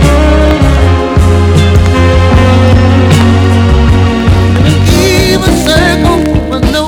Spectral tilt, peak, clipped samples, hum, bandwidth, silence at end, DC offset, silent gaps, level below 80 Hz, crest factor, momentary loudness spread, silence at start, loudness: -6 dB/octave; 0 dBFS; 4%; none; 16 kHz; 0 s; under 0.1%; none; -12 dBFS; 6 dB; 2 LU; 0 s; -7 LUFS